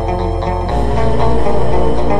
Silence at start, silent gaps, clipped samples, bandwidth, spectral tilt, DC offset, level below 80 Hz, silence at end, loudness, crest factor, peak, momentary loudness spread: 0 s; none; under 0.1%; 11 kHz; -8 dB/octave; under 0.1%; -20 dBFS; 0 s; -16 LUFS; 12 dB; -2 dBFS; 3 LU